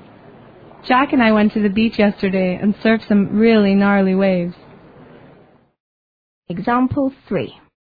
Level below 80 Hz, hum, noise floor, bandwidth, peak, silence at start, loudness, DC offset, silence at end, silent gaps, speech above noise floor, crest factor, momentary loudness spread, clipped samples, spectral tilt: -48 dBFS; none; -50 dBFS; 5 kHz; -2 dBFS; 0.85 s; -16 LUFS; under 0.1%; 0.45 s; 5.80-6.42 s; 34 dB; 14 dB; 11 LU; under 0.1%; -9.5 dB/octave